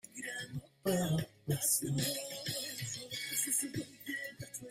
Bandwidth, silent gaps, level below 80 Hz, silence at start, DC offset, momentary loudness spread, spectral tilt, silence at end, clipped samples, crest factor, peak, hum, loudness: 16 kHz; none; -68 dBFS; 0.05 s; under 0.1%; 11 LU; -3.5 dB/octave; 0 s; under 0.1%; 18 dB; -18 dBFS; none; -36 LUFS